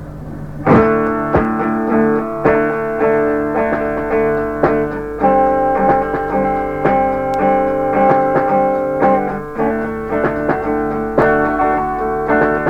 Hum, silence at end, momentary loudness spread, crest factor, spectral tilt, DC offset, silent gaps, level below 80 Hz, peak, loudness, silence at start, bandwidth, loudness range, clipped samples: none; 0 s; 5 LU; 14 dB; -9 dB/octave; under 0.1%; none; -36 dBFS; 0 dBFS; -15 LUFS; 0 s; 8.6 kHz; 2 LU; under 0.1%